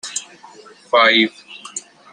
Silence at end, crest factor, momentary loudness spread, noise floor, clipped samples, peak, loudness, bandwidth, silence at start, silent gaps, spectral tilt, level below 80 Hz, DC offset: 0.35 s; 18 dB; 19 LU; -42 dBFS; under 0.1%; -2 dBFS; -15 LUFS; 12.5 kHz; 0.05 s; none; -1.5 dB/octave; -74 dBFS; under 0.1%